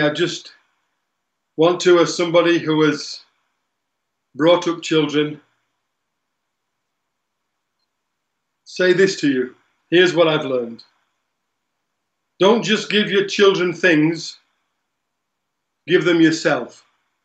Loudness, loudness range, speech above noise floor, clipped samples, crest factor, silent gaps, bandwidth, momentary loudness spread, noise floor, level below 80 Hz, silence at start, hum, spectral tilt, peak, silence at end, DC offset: -17 LUFS; 5 LU; 60 dB; under 0.1%; 18 dB; none; 8.6 kHz; 14 LU; -77 dBFS; -76 dBFS; 0 s; none; -4.5 dB/octave; -2 dBFS; 0.55 s; under 0.1%